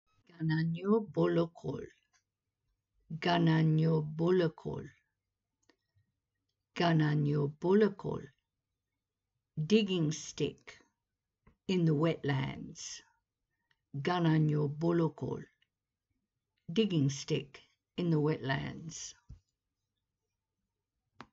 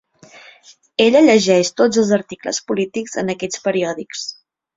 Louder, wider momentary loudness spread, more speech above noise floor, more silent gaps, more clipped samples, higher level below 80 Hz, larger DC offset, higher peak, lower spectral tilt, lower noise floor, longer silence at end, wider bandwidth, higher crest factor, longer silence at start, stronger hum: second, -32 LUFS vs -17 LUFS; about the same, 16 LU vs 14 LU; first, 58 dB vs 27 dB; neither; neither; second, -68 dBFS vs -60 dBFS; neither; second, -14 dBFS vs -2 dBFS; first, -6.5 dB/octave vs -4 dB/octave; first, -90 dBFS vs -44 dBFS; second, 0.1 s vs 0.45 s; about the same, 7.8 kHz vs 7.8 kHz; about the same, 20 dB vs 16 dB; second, 0.4 s vs 1 s; neither